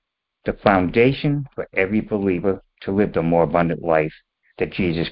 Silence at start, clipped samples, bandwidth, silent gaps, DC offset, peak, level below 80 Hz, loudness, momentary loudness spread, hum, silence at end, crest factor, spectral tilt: 0.45 s; under 0.1%; 5.4 kHz; none; under 0.1%; 0 dBFS; -44 dBFS; -21 LUFS; 10 LU; none; 0 s; 20 dB; -12 dB/octave